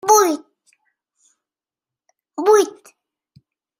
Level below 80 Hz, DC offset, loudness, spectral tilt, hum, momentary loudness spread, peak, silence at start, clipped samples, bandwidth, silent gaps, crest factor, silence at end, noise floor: -76 dBFS; under 0.1%; -17 LUFS; -1.5 dB/octave; none; 14 LU; -2 dBFS; 0.05 s; under 0.1%; 16 kHz; none; 20 dB; 1.1 s; -89 dBFS